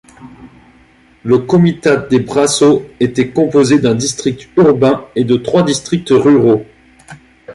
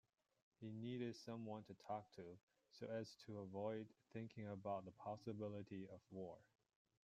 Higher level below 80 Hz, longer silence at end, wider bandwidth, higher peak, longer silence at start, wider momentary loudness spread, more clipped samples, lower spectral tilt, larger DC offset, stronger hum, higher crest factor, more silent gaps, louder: first, -48 dBFS vs -88 dBFS; second, 0 s vs 0.6 s; second, 11.5 kHz vs 13 kHz; first, 0 dBFS vs -34 dBFS; second, 0.2 s vs 0.6 s; about the same, 7 LU vs 9 LU; neither; second, -5.5 dB/octave vs -7 dB/octave; neither; neither; second, 12 dB vs 18 dB; second, none vs 2.43-2.47 s; first, -12 LUFS vs -53 LUFS